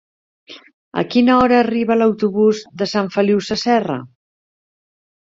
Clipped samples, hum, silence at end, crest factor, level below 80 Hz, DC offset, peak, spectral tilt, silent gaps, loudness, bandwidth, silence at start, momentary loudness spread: under 0.1%; none; 1.15 s; 16 dB; -52 dBFS; under 0.1%; -2 dBFS; -6 dB/octave; 0.74-0.91 s; -16 LUFS; 7.6 kHz; 0.5 s; 11 LU